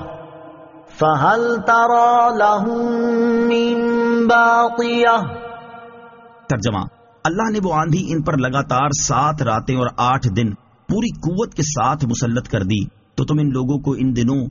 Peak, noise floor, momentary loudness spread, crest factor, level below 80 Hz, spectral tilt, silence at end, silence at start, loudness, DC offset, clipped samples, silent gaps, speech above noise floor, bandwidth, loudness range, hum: -2 dBFS; -43 dBFS; 10 LU; 16 dB; -44 dBFS; -5.5 dB/octave; 0 s; 0 s; -17 LUFS; under 0.1%; under 0.1%; none; 26 dB; 7.2 kHz; 5 LU; none